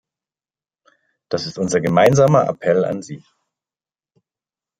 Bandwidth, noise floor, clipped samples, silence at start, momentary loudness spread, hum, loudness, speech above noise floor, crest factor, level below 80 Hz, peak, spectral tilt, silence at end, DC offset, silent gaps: 15.5 kHz; under -90 dBFS; under 0.1%; 1.3 s; 16 LU; none; -17 LUFS; over 74 dB; 18 dB; -58 dBFS; -2 dBFS; -6 dB/octave; 1.65 s; under 0.1%; none